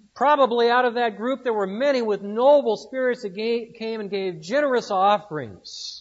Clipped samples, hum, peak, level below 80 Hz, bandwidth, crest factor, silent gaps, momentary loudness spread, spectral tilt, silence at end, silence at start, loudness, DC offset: under 0.1%; none; -6 dBFS; -72 dBFS; 8 kHz; 16 dB; none; 13 LU; -4.5 dB/octave; 0 s; 0.15 s; -22 LUFS; under 0.1%